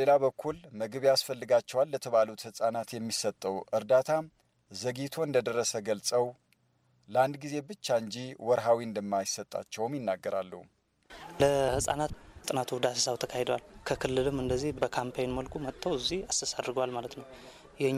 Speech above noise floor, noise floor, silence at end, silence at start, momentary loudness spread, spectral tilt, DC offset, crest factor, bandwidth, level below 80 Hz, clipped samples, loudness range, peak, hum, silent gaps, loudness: 39 dB; -70 dBFS; 0 s; 0 s; 11 LU; -4 dB/octave; under 0.1%; 18 dB; 15.5 kHz; -56 dBFS; under 0.1%; 3 LU; -12 dBFS; none; none; -31 LUFS